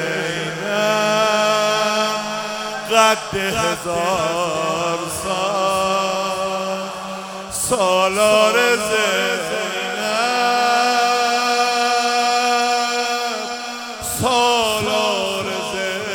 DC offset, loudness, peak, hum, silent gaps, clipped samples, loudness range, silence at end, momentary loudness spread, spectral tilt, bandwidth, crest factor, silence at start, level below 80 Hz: under 0.1%; -18 LUFS; 0 dBFS; none; none; under 0.1%; 3 LU; 0 s; 9 LU; -2.5 dB/octave; 19 kHz; 18 dB; 0 s; -52 dBFS